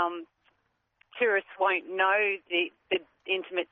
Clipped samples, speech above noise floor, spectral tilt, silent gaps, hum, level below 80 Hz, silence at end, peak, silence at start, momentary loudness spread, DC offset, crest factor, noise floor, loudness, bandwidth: under 0.1%; 46 dB; 1 dB/octave; none; none; -80 dBFS; 0.05 s; -12 dBFS; 0 s; 8 LU; under 0.1%; 18 dB; -75 dBFS; -28 LUFS; 4 kHz